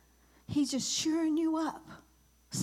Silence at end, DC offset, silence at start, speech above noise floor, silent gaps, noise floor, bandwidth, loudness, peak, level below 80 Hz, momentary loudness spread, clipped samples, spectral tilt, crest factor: 0 s; under 0.1%; 0.5 s; 24 dB; none; -55 dBFS; 14.5 kHz; -32 LUFS; -22 dBFS; -66 dBFS; 9 LU; under 0.1%; -3.5 dB/octave; 12 dB